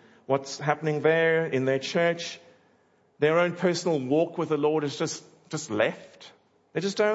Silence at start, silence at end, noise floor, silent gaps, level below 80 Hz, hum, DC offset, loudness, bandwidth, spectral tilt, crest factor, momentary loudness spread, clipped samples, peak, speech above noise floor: 0.3 s; 0 s; -64 dBFS; none; -78 dBFS; none; under 0.1%; -26 LUFS; 8 kHz; -5 dB/octave; 20 dB; 13 LU; under 0.1%; -8 dBFS; 39 dB